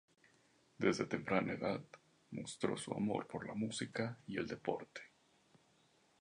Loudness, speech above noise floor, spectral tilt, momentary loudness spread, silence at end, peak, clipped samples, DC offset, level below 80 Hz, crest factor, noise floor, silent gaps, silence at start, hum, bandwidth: -41 LUFS; 33 dB; -5 dB/octave; 14 LU; 1.15 s; -18 dBFS; under 0.1%; under 0.1%; -74 dBFS; 24 dB; -73 dBFS; none; 0.8 s; none; 11 kHz